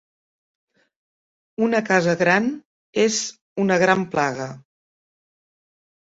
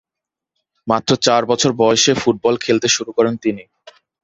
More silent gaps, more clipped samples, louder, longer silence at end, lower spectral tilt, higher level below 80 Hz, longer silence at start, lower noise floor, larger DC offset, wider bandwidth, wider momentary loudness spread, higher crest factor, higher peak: first, 2.65-2.93 s, 3.41-3.56 s vs none; neither; second, -20 LUFS vs -16 LUFS; first, 1.55 s vs 0.6 s; about the same, -4.5 dB/octave vs -3.5 dB/octave; second, -64 dBFS vs -54 dBFS; first, 1.6 s vs 0.85 s; first, under -90 dBFS vs -85 dBFS; neither; about the same, 8 kHz vs 8 kHz; first, 13 LU vs 9 LU; first, 22 dB vs 16 dB; about the same, -2 dBFS vs 0 dBFS